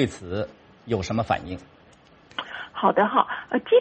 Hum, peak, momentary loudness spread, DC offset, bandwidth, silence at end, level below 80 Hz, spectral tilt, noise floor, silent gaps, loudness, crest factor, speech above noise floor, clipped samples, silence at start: none; -2 dBFS; 15 LU; under 0.1%; 8.4 kHz; 0 s; -54 dBFS; -6 dB/octave; -54 dBFS; none; -25 LUFS; 22 dB; 31 dB; under 0.1%; 0 s